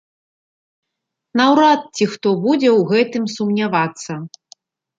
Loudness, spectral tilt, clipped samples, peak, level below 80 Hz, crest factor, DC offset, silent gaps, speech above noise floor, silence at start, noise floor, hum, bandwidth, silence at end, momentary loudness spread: -16 LUFS; -5.5 dB/octave; under 0.1%; -2 dBFS; -66 dBFS; 16 dB; under 0.1%; none; 64 dB; 1.35 s; -80 dBFS; none; 9.2 kHz; 0.7 s; 15 LU